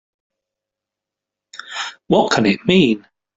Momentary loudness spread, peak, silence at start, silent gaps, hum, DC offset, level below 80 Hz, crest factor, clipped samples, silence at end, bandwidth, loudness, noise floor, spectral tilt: 14 LU; -2 dBFS; 1.55 s; none; none; under 0.1%; -54 dBFS; 18 dB; under 0.1%; 0.4 s; 7.8 kHz; -17 LUFS; -85 dBFS; -5.5 dB/octave